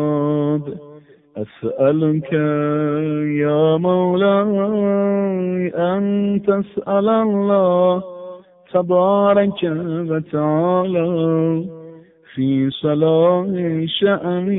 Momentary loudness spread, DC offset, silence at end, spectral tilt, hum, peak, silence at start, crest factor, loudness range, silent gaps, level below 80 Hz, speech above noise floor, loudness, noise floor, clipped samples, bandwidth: 9 LU; under 0.1%; 0 s; -12.5 dB/octave; none; -4 dBFS; 0 s; 14 dB; 3 LU; none; -60 dBFS; 27 dB; -18 LUFS; -43 dBFS; under 0.1%; 4 kHz